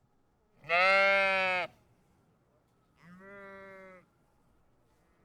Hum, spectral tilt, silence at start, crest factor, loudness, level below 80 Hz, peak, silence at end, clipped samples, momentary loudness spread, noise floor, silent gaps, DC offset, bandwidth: none; -3 dB/octave; 0.65 s; 20 dB; -26 LUFS; -72 dBFS; -14 dBFS; 1.4 s; under 0.1%; 26 LU; -71 dBFS; none; under 0.1%; 11.5 kHz